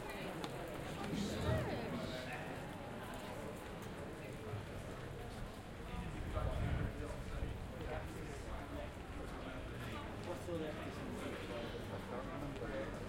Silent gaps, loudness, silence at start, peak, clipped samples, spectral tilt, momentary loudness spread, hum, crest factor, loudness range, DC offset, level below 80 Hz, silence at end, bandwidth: none; -45 LUFS; 0 s; -24 dBFS; under 0.1%; -6 dB/octave; 8 LU; none; 20 dB; 4 LU; under 0.1%; -52 dBFS; 0 s; 16.5 kHz